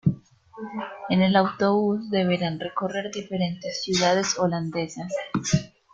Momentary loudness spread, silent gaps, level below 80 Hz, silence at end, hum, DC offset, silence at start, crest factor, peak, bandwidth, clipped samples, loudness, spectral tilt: 12 LU; none; -58 dBFS; 0.25 s; none; under 0.1%; 0.05 s; 18 dB; -6 dBFS; 7.8 kHz; under 0.1%; -25 LUFS; -5 dB/octave